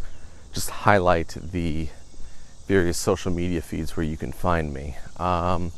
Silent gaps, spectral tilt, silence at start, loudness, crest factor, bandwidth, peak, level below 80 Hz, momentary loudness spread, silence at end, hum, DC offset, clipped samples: none; -5.5 dB/octave; 0 s; -25 LUFS; 24 dB; 13.5 kHz; -2 dBFS; -38 dBFS; 16 LU; 0 s; none; under 0.1%; under 0.1%